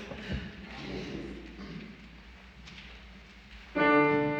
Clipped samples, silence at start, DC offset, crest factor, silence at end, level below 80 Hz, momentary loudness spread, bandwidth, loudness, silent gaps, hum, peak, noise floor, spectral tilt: under 0.1%; 0 s; under 0.1%; 20 dB; 0 s; -50 dBFS; 26 LU; 7.6 kHz; -30 LUFS; none; none; -14 dBFS; -51 dBFS; -6.5 dB/octave